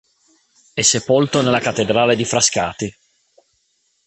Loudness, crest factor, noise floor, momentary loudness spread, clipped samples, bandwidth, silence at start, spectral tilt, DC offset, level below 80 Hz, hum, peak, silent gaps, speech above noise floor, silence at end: -16 LUFS; 18 dB; -65 dBFS; 11 LU; under 0.1%; 9 kHz; 0.75 s; -3 dB/octave; under 0.1%; -52 dBFS; none; 0 dBFS; none; 48 dB; 1.15 s